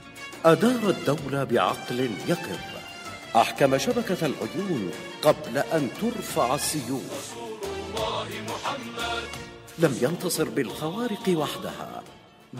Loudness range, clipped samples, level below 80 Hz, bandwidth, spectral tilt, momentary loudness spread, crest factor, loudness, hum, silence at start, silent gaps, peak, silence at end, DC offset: 4 LU; under 0.1%; -56 dBFS; 16 kHz; -4.5 dB/octave; 13 LU; 22 dB; -26 LUFS; none; 0 s; none; -6 dBFS; 0 s; under 0.1%